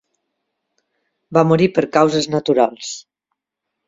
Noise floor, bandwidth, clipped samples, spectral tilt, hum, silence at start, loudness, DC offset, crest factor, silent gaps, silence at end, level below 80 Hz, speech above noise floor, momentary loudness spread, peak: -80 dBFS; 7.8 kHz; under 0.1%; -5.5 dB/octave; none; 1.3 s; -16 LUFS; under 0.1%; 18 dB; none; 0.85 s; -58 dBFS; 64 dB; 15 LU; 0 dBFS